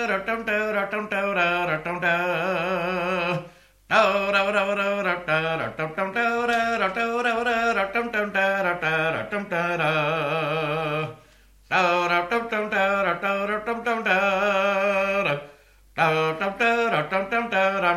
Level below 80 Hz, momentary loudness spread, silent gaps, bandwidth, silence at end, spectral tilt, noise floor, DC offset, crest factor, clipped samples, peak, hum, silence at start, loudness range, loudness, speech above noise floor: -58 dBFS; 5 LU; none; 14 kHz; 0 s; -5 dB/octave; -54 dBFS; under 0.1%; 18 dB; under 0.1%; -6 dBFS; none; 0 s; 1 LU; -23 LUFS; 30 dB